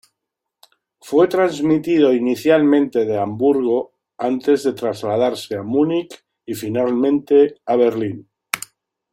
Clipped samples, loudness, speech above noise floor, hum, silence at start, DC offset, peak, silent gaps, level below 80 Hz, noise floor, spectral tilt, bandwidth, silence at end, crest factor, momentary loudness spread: under 0.1%; -18 LUFS; 64 dB; none; 1.05 s; under 0.1%; 0 dBFS; none; -62 dBFS; -81 dBFS; -6 dB/octave; 16.5 kHz; 0.55 s; 18 dB; 12 LU